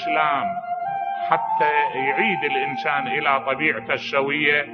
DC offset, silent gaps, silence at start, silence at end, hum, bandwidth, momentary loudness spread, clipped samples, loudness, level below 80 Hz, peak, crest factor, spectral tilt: under 0.1%; none; 0 s; 0 s; none; 6.6 kHz; 7 LU; under 0.1%; -21 LUFS; -70 dBFS; -2 dBFS; 20 dB; -5.5 dB/octave